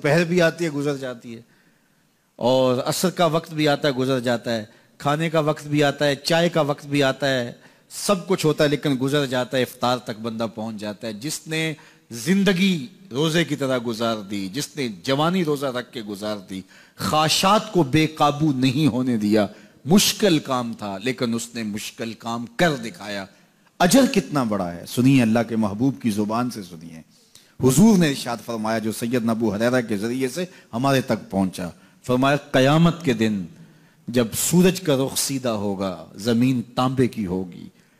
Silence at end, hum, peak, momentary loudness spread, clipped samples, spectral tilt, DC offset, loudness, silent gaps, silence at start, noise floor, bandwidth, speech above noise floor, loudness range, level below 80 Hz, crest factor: 0.3 s; none; -6 dBFS; 13 LU; under 0.1%; -5 dB/octave; under 0.1%; -22 LUFS; none; 0 s; -63 dBFS; 15.5 kHz; 41 dB; 4 LU; -54 dBFS; 16 dB